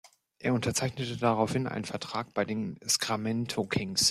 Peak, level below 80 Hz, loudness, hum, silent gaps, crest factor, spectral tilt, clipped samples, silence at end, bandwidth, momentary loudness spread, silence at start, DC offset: -12 dBFS; -62 dBFS; -30 LUFS; none; none; 20 dB; -3.5 dB/octave; under 0.1%; 0 s; 15 kHz; 7 LU; 0.4 s; under 0.1%